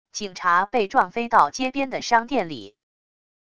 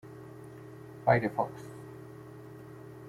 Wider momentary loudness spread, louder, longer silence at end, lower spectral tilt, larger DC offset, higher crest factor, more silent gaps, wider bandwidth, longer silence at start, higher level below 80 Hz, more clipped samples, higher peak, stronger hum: second, 10 LU vs 21 LU; first, -21 LUFS vs -30 LUFS; first, 0.8 s vs 0 s; second, -3.5 dB/octave vs -8 dB/octave; first, 0.6% vs under 0.1%; second, 20 dB vs 26 dB; neither; second, 11 kHz vs 16 kHz; about the same, 0.15 s vs 0.05 s; first, -58 dBFS vs -68 dBFS; neither; first, -2 dBFS vs -10 dBFS; neither